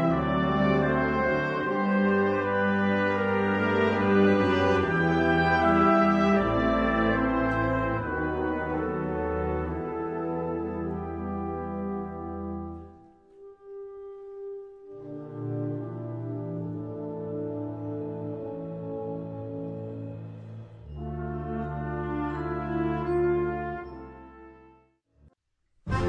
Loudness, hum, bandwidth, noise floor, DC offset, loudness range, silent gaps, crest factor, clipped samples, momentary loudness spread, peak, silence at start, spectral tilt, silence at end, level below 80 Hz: -27 LUFS; none; 8 kHz; -71 dBFS; under 0.1%; 14 LU; none; 18 dB; under 0.1%; 18 LU; -10 dBFS; 0 s; -8 dB/octave; 0 s; -46 dBFS